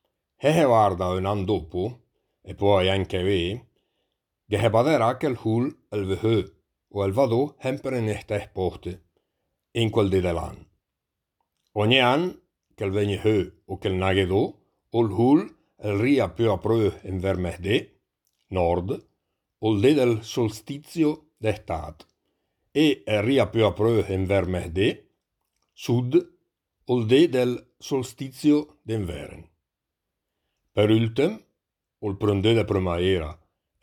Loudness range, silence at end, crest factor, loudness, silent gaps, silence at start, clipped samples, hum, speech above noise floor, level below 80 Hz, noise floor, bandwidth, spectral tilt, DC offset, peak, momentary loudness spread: 4 LU; 0.5 s; 20 dB; -24 LUFS; none; 0.4 s; under 0.1%; none; 61 dB; -50 dBFS; -84 dBFS; 18 kHz; -6.5 dB/octave; under 0.1%; -4 dBFS; 13 LU